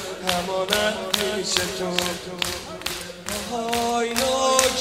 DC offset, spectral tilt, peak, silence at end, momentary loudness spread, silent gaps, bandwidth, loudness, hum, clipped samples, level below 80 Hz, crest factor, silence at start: under 0.1%; -2 dB/octave; -2 dBFS; 0 s; 10 LU; none; 16 kHz; -23 LUFS; none; under 0.1%; -50 dBFS; 22 dB; 0 s